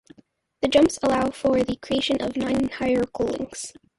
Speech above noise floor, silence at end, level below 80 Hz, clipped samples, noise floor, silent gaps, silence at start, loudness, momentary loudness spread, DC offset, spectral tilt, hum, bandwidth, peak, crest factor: 36 dB; 0.3 s; -50 dBFS; under 0.1%; -58 dBFS; none; 0.6 s; -23 LUFS; 9 LU; under 0.1%; -4.5 dB/octave; none; 11.5 kHz; -6 dBFS; 18 dB